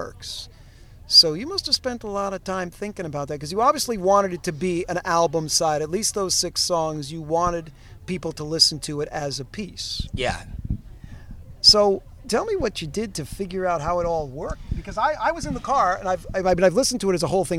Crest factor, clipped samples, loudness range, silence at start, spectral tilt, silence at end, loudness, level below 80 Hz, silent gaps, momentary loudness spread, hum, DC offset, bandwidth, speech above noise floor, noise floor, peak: 22 dB; under 0.1%; 4 LU; 0 s; -3 dB/octave; 0 s; -22 LUFS; -40 dBFS; none; 15 LU; none; under 0.1%; 16 kHz; 23 dB; -46 dBFS; -2 dBFS